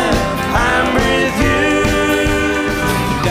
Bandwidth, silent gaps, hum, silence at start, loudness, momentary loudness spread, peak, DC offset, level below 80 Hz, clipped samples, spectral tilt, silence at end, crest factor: 16 kHz; none; none; 0 s; -14 LUFS; 3 LU; -4 dBFS; under 0.1%; -26 dBFS; under 0.1%; -4.5 dB/octave; 0 s; 12 dB